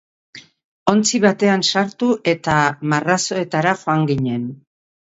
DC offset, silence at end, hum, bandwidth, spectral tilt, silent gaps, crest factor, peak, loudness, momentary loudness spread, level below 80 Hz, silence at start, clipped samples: under 0.1%; 0.5 s; none; 8 kHz; -4.5 dB/octave; 0.64-0.86 s; 18 dB; 0 dBFS; -18 LUFS; 6 LU; -54 dBFS; 0.35 s; under 0.1%